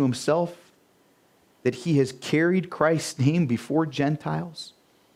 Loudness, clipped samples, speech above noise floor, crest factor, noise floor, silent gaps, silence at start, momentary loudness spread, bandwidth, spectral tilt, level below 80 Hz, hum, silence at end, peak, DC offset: -25 LUFS; under 0.1%; 38 dB; 20 dB; -62 dBFS; none; 0 s; 9 LU; 15 kHz; -6.5 dB/octave; -66 dBFS; none; 0.45 s; -4 dBFS; under 0.1%